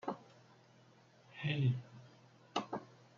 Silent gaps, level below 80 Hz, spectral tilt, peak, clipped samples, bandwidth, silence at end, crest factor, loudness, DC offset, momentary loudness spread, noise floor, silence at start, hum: none; -78 dBFS; -5.5 dB/octave; -22 dBFS; under 0.1%; 7.2 kHz; 0.3 s; 20 dB; -40 LUFS; under 0.1%; 24 LU; -65 dBFS; 0.05 s; none